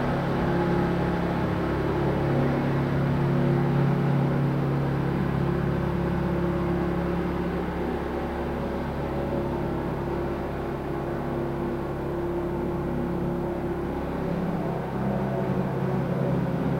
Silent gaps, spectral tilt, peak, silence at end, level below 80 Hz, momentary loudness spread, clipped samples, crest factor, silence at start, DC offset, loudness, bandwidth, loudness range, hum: none; -9 dB/octave; -12 dBFS; 0 s; -40 dBFS; 6 LU; under 0.1%; 14 dB; 0 s; under 0.1%; -27 LUFS; 15.5 kHz; 5 LU; none